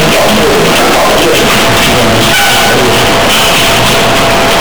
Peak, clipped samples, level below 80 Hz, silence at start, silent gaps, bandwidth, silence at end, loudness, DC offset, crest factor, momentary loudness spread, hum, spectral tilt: -4 dBFS; under 0.1%; -26 dBFS; 0 s; none; over 20 kHz; 0 s; -6 LUFS; 10%; 2 dB; 1 LU; none; -3 dB/octave